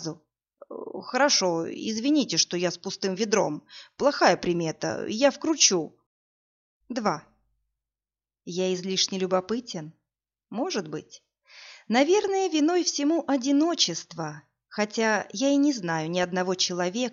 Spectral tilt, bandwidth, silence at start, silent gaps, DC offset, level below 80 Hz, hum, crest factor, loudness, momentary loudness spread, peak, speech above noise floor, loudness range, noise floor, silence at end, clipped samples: -3 dB/octave; 7.4 kHz; 0 s; 6.06-6.80 s; under 0.1%; -70 dBFS; none; 22 dB; -25 LUFS; 16 LU; -6 dBFS; over 65 dB; 6 LU; under -90 dBFS; 0 s; under 0.1%